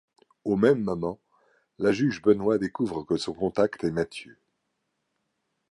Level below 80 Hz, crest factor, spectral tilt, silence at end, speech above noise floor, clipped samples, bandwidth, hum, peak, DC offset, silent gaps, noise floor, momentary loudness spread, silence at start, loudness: -58 dBFS; 20 dB; -6.5 dB/octave; 1.4 s; 53 dB; under 0.1%; 11 kHz; none; -8 dBFS; under 0.1%; none; -78 dBFS; 11 LU; 0.45 s; -26 LUFS